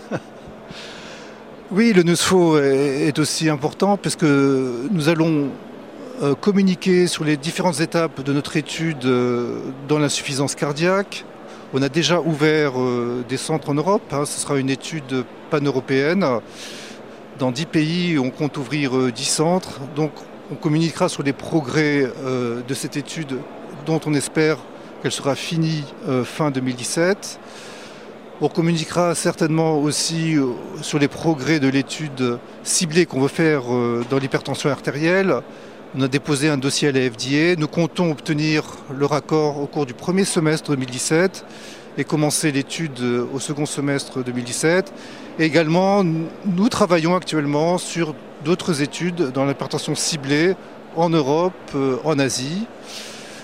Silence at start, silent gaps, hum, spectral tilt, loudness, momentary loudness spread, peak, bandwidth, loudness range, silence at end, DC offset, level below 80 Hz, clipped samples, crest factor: 0 s; none; none; -5 dB/octave; -20 LUFS; 15 LU; -2 dBFS; 16 kHz; 4 LU; 0 s; 0.2%; -60 dBFS; under 0.1%; 20 dB